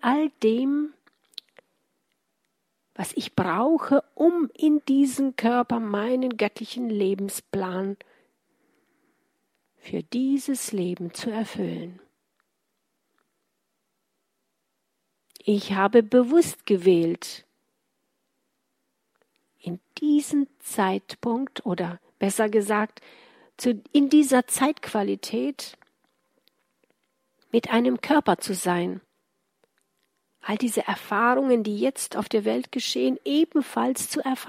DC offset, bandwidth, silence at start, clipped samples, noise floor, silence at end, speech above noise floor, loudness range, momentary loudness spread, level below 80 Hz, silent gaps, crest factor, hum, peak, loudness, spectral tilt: under 0.1%; 16 kHz; 0.05 s; under 0.1%; -78 dBFS; 0 s; 54 dB; 8 LU; 13 LU; -72 dBFS; none; 22 dB; none; -4 dBFS; -24 LUFS; -4.5 dB/octave